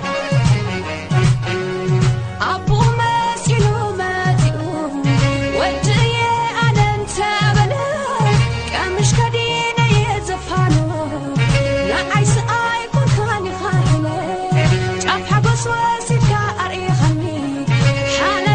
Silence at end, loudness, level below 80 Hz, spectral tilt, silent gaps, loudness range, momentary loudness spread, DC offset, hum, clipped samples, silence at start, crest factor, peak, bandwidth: 0 s; -17 LUFS; -32 dBFS; -5.5 dB/octave; none; 1 LU; 5 LU; under 0.1%; none; under 0.1%; 0 s; 14 dB; -2 dBFS; 9.6 kHz